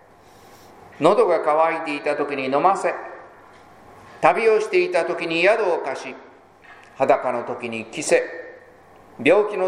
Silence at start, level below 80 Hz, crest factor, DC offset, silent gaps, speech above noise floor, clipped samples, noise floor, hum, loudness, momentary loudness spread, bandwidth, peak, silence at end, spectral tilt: 1 s; -66 dBFS; 22 dB; under 0.1%; none; 29 dB; under 0.1%; -49 dBFS; none; -20 LUFS; 15 LU; 11.5 kHz; 0 dBFS; 0 s; -4 dB/octave